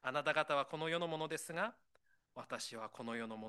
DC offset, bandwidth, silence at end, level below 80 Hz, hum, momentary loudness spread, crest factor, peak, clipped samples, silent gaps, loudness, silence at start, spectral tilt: under 0.1%; 12 kHz; 0 s; -86 dBFS; none; 12 LU; 22 dB; -18 dBFS; under 0.1%; none; -40 LUFS; 0.05 s; -3.5 dB/octave